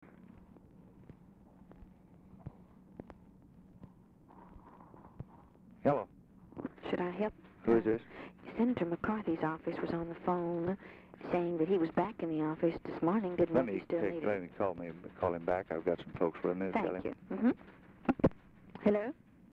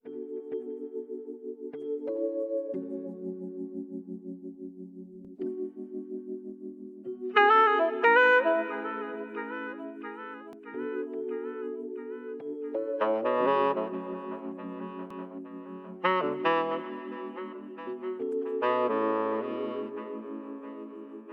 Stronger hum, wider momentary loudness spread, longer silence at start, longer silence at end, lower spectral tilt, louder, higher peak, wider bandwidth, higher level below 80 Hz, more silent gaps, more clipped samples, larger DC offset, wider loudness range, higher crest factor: neither; about the same, 21 LU vs 19 LU; about the same, 0.15 s vs 0.05 s; first, 0.4 s vs 0 s; first, -9.5 dB/octave vs -6.5 dB/octave; second, -35 LUFS vs -30 LUFS; second, -18 dBFS vs -10 dBFS; second, 5.6 kHz vs 6.8 kHz; first, -62 dBFS vs -84 dBFS; neither; neither; neither; first, 22 LU vs 13 LU; about the same, 18 dB vs 20 dB